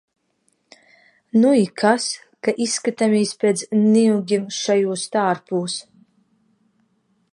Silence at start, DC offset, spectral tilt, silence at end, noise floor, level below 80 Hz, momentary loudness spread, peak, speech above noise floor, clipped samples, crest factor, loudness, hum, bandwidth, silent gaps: 1.35 s; under 0.1%; -4.5 dB/octave; 1.5 s; -67 dBFS; -74 dBFS; 9 LU; -2 dBFS; 49 dB; under 0.1%; 20 dB; -19 LUFS; none; 11 kHz; none